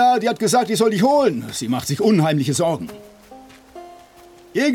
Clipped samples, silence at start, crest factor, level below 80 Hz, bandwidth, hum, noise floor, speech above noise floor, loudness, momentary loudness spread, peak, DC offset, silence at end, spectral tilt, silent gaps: under 0.1%; 0 s; 14 dB; -58 dBFS; 17.5 kHz; none; -46 dBFS; 28 dB; -18 LUFS; 12 LU; -4 dBFS; under 0.1%; 0 s; -5 dB/octave; none